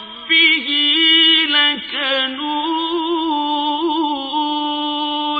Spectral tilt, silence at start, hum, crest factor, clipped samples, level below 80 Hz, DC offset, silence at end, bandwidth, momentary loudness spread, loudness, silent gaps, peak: -3 dB/octave; 0 s; none; 14 dB; under 0.1%; -60 dBFS; under 0.1%; 0 s; 5 kHz; 10 LU; -15 LUFS; none; -2 dBFS